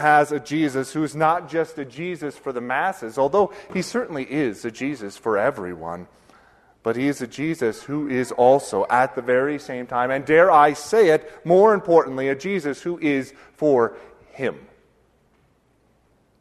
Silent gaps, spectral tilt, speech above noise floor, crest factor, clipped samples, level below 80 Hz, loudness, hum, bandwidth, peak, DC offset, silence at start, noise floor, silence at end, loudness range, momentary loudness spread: none; -5.5 dB/octave; 41 dB; 20 dB; under 0.1%; -60 dBFS; -21 LUFS; none; 13.5 kHz; -2 dBFS; under 0.1%; 0 s; -62 dBFS; 1.8 s; 8 LU; 13 LU